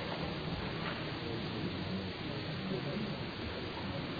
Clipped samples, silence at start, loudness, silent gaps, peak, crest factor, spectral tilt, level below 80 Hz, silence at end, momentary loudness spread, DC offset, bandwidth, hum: under 0.1%; 0 s; -39 LUFS; none; -24 dBFS; 14 dB; -4.5 dB/octave; -56 dBFS; 0 s; 2 LU; under 0.1%; 5 kHz; none